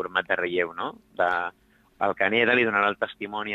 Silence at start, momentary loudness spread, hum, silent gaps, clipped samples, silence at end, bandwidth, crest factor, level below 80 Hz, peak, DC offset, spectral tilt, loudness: 0 s; 12 LU; none; none; under 0.1%; 0 s; 7.8 kHz; 20 dB; -66 dBFS; -6 dBFS; under 0.1%; -6 dB/octave; -25 LUFS